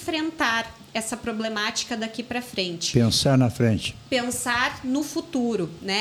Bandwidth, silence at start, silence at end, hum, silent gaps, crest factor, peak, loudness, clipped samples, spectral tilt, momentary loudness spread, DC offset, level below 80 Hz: 19 kHz; 0 s; 0 s; none; none; 20 dB; -6 dBFS; -24 LUFS; under 0.1%; -4.5 dB/octave; 9 LU; under 0.1%; -52 dBFS